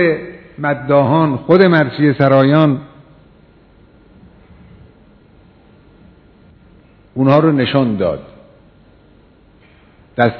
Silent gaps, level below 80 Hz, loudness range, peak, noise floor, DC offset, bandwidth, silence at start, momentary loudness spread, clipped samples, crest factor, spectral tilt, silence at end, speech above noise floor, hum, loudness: none; -50 dBFS; 7 LU; 0 dBFS; -47 dBFS; under 0.1%; 5.4 kHz; 0 s; 13 LU; 0.2%; 16 dB; -10 dB/octave; 0 s; 35 dB; none; -13 LUFS